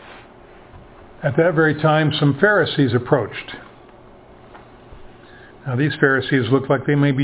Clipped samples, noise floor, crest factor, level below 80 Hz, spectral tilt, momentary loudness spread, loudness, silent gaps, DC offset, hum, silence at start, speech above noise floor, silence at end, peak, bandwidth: under 0.1%; -44 dBFS; 20 dB; -50 dBFS; -10.5 dB/octave; 12 LU; -18 LUFS; none; under 0.1%; none; 0.05 s; 27 dB; 0 s; 0 dBFS; 4 kHz